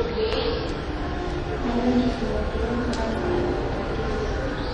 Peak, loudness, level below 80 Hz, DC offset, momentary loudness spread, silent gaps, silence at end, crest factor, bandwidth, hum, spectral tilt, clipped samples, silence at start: -10 dBFS; -26 LUFS; -32 dBFS; under 0.1%; 6 LU; none; 0 s; 16 dB; 10.5 kHz; none; -6.5 dB/octave; under 0.1%; 0 s